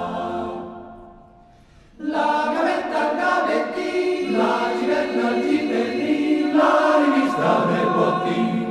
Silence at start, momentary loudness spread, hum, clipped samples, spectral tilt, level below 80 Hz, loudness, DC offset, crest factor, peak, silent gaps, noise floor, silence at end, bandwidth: 0 s; 10 LU; none; under 0.1%; -6 dB/octave; -58 dBFS; -20 LUFS; under 0.1%; 16 dB; -4 dBFS; none; -50 dBFS; 0 s; 12 kHz